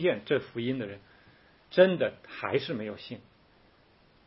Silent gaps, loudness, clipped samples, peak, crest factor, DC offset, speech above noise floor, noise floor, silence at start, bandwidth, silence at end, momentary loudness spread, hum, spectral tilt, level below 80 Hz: none; -29 LUFS; under 0.1%; -8 dBFS; 22 dB; under 0.1%; 33 dB; -62 dBFS; 0 s; 5.8 kHz; 1.05 s; 19 LU; none; -9.5 dB/octave; -70 dBFS